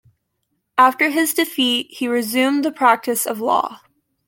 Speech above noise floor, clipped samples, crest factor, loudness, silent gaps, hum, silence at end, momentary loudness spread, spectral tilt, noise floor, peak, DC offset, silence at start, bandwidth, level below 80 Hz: 55 dB; under 0.1%; 18 dB; -18 LUFS; none; none; 0.5 s; 6 LU; -2 dB/octave; -72 dBFS; -2 dBFS; under 0.1%; 0.75 s; 17 kHz; -70 dBFS